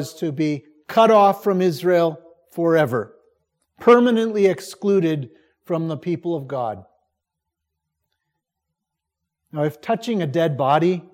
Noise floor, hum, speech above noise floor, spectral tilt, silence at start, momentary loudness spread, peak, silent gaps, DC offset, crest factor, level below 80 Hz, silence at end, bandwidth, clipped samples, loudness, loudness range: -82 dBFS; none; 63 dB; -7 dB/octave; 0 s; 14 LU; -2 dBFS; none; under 0.1%; 20 dB; -72 dBFS; 0.15 s; 16.5 kHz; under 0.1%; -20 LUFS; 13 LU